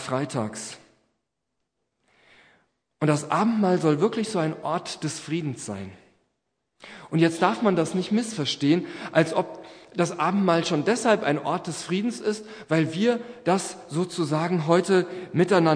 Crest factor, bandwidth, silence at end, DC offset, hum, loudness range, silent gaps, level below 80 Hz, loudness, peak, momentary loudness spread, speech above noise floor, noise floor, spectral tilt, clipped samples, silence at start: 22 dB; 10.5 kHz; 0 s; under 0.1%; none; 5 LU; none; -72 dBFS; -25 LUFS; -4 dBFS; 11 LU; 57 dB; -81 dBFS; -5.5 dB/octave; under 0.1%; 0 s